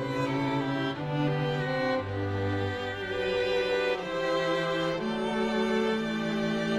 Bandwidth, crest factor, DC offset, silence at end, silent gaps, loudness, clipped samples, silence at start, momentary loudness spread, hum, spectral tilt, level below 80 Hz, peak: 13.5 kHz; 14 dB; under 0.1%; 0 s; none; -29 LUFS; under 0.1%; 0 s; 4 LU; none; -6 dB/octave; -56 dBFS; -16 dBFS